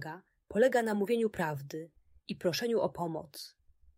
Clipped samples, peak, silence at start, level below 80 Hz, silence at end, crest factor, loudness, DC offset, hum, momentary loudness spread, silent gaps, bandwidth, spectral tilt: under 0.1%; -14 dBFS; 0 s; -68 dBFS; 0.5 s; 18 dB; -32 LUFS; under 0.1%; none; 21 LU; none; 16 kHz; -5.5 dB/octave